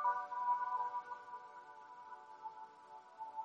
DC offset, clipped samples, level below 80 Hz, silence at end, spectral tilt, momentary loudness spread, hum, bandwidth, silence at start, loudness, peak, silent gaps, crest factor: under 0.1%; under 0.1%; under -90 dBFS; 0 s; -3 dB/octave; 18 LU; none; 7.6 kHz; 0 s; -42 LUFS; -24 dBFS; none; 18 dB